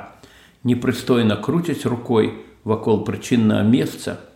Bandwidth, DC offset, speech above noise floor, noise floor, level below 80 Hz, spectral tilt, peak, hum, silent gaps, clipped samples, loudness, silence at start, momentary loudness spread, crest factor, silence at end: 16.5 kHz; under 0.1%; 29 dB; -48 dBFS; -54 dBFS; -6.5 dB/octave; -4 dBFS; none; none; under 0.1%; -20 LUFS; 0 s; 8 LU; 16 dB; 0.1 s